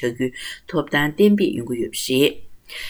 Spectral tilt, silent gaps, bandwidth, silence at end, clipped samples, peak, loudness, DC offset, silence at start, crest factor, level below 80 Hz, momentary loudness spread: -5 dB/octave; none; over 20 kHz; 0 s; under 0.1%; -4 dBFS; -20 LUFS; under 0.1%; 0 s; 18 dB; -52 dBFS; 10 LU